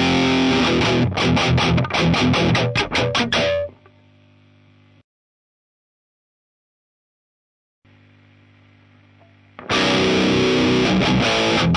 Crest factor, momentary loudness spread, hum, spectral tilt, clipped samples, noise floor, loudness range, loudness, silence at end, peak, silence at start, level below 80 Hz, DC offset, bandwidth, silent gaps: 14 dB; 3 LU; 50 Hz at -55 dBFS; -5 dB/octave; under 0.1%; -52 dBFS; 10 LU; -17 LUFS; 0 s; -6 dBFS; 0 s; -40 dBFS; under 0.1%; 10.5 kHz; 5.04-7.82 s